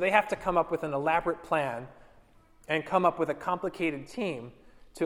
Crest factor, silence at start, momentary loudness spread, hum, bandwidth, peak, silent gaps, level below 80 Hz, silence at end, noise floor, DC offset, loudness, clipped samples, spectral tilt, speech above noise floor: 22 dB; 0 s; 10 LU; none; 18 kHz; -8 dBFS; none; -56 dBFS; 0 s; -58 dBFS; under 0.1%; -29 LUFS; under 0.1%; -6 dB/octave; 29 dB